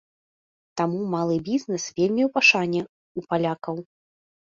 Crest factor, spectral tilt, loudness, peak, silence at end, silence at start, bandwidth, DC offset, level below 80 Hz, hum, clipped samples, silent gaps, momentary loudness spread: 22 dB; -4.5 dB/octave; -23 LUFS; -4 dBFS; 0.7 s; 0.75 s; 7.6 kHz; under 0.1%; -66 dBFS; none; under 0.1%; 2.89-3.15 s; 18 LU